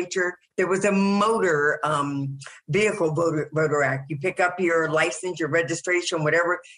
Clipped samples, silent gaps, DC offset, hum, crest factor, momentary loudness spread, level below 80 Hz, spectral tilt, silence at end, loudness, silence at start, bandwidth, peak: under 0.1%; none; under 0.1%; none; 14 dB; 6 LU; -62 dBFS; -5 dB/octave; 0.05 s; -23 LUFS; 0 s; 11.5 kHz; -8 dBFS